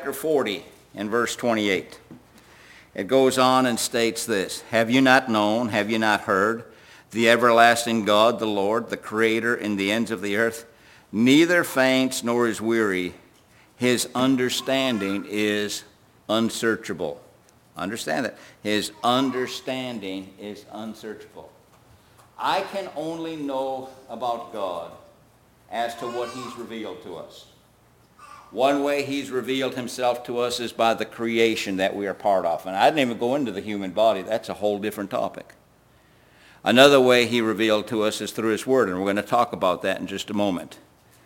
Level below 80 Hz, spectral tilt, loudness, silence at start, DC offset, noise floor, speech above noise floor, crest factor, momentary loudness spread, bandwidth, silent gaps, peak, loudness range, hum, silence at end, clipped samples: -64 dBFS; -4 dB/octave; -23 LUFS; 0 s; under 0.1%; -57 dBFS; 34 dB; 24 dB; 16 LU; 17 kHz; none; 0 dBFS; 11 LU; none; 0.5 s; under 0.1%